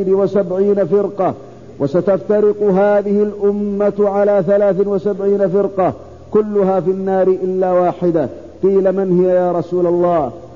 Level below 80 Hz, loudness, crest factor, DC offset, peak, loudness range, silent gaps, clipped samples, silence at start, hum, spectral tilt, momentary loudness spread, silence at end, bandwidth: -50 dBFS; -15 LUFS; 12 dB; 0.5%; -4 dBFS; 1 LU; none; under 0.1%; 0 s; none; -9.5 dB/octave; 5 LU; 0 s; 7 kHz